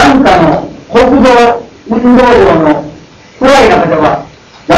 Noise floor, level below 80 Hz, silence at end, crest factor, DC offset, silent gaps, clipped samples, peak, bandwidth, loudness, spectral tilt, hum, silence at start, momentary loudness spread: -33 dBFS; -30 dBFS; 0 s; 6 dB; under 0.1%; none; 3%; 0 dBFS; 12.5 kHz; -7 LUFS; -5.5 dB/octave; none; 0 s; 11 LU